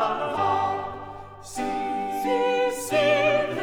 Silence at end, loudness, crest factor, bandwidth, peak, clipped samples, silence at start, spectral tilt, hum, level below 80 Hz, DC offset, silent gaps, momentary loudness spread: 0 s; -24 LUFS; 14 dB; over 20 kHz; -10 dBFS; under 0.1%; 0 s; -4 dB/octave; none; -54 dBFS; under 0.1%; none; 16 LU